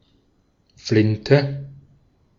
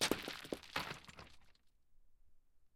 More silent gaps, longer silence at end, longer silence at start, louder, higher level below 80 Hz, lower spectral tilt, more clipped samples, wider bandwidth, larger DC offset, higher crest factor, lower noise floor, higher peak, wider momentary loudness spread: neither; first, 0.65 s vs 0.1 s; first, 0.85 s vs 0 s; first, -19 LUFS vs -44 LUFS; first, -54 dBFS vs -68 dBFS; first, -7 dB/octave vs -2.5 dB/octave; neither; second, 7.4 kHz vs 16 kHz; neither; about the same, 22 dB vs 26 dB; second, -63 dBFS vs -67 dBFS; first, -2 dBFS vs -20 dBFS; about the same, 17 LU vs 18 LU